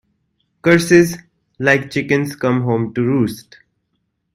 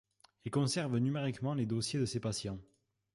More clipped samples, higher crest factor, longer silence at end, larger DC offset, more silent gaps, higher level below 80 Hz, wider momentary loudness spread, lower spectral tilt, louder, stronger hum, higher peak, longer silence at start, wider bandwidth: neither; about the same, 18 dB vs 14 dB; first, 0.95 s vs 0.5 s; neither; neither; first, -52 dBFS vs -64 dBFS; about the same, 9 LU vs 9 LU; about the same, -6 dB/octave vs -5.5 dB/octave; first, -16 LUFS vs -35 LUFS; neither; first, 0 dBFS vs -22 dBFS; first, 0.65 s vs 0.45 s; first, 16 kHz vs 11.5 kHz